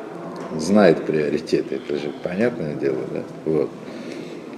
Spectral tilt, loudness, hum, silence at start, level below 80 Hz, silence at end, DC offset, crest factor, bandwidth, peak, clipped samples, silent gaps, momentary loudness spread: -6.5 dB/octave; -22 LUFS; none; 0 s; -58 dBFS; 0 s; under 0.1%; 20 dB; 12 kHz; -2 dBFS; under 0.1%; none; 17 LU